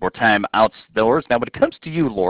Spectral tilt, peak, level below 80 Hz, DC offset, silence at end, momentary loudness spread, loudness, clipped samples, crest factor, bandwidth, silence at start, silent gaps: -9.5 dB/octave; -2 dBFS; -48 dBFS; under 0.1%; 0 s; 6 LU; -18 LUFS; under 0.1%; 16 dB; 4 kHz; 0 s; none